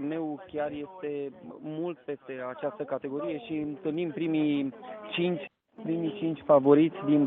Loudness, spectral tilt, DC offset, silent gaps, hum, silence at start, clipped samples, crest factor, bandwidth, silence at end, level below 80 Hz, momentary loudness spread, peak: -30 LUFS; -6 dB/octave; under 0.1%; none; none; 0 s; under 0.1%; 22 dB; 4 kHz; 0 s; -74 dBFS; 16 LU; -8 dBFS